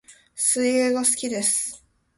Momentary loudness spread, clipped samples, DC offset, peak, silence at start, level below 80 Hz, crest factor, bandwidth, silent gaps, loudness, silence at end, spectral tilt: 8 LU; under 0.1%; under 0.1%; -8 dBFS; 0.1 s; -66 dBFS; 18 dB; 12 kHz; none; -21 LUFS; 0.4 s; -1.5 dB/octave